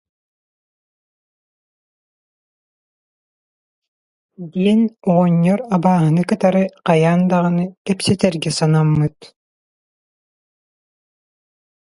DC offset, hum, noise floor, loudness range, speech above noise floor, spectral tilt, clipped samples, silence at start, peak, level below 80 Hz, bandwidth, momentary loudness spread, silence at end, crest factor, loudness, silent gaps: under 0.1%; none; under -90 dBFS; 8 LU; over 74 dB; -7 dB/octave; under 0.1%; 4.4 s; 0 dBFS; -54 dBFS; 11.5 kHz; 6 LU; 2.7 s; 20 dB; -16 LUFS; 7.77-7.85 s